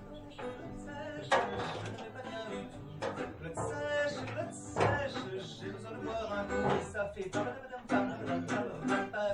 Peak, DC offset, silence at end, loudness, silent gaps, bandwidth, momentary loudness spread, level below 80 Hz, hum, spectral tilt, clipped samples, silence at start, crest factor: -16 dBFS; under 0.1%; 0 s; -37 LUFS; none; 11 kHz; 12 LU; -58 dBFS; none; -5.5 dB/octave; under 0.1%; 0 s; 22 dB